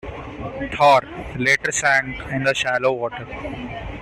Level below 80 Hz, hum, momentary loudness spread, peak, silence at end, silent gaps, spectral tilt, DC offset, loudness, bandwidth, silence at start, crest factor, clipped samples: -42 dBFS; none; 16 LU; -4 dBFS; 0 s; none; -3.5 dB/octave; under 0.1%; -19 LUFS; 14 kHz; 0.05 s; 18 dB; under 0.1%